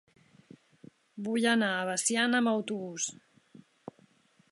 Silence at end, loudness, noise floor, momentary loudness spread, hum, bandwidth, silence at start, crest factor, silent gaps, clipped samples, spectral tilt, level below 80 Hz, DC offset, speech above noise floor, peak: 1.4 s; -29 LUFS; -65 dBFS; 24 LU; none; 11.5 kHz; 1.15 s; 20 dB; none; under 0.1%; -2.5 dB/octave; -82 dBFS; under 0.1%; 36 dB; -12 dBFS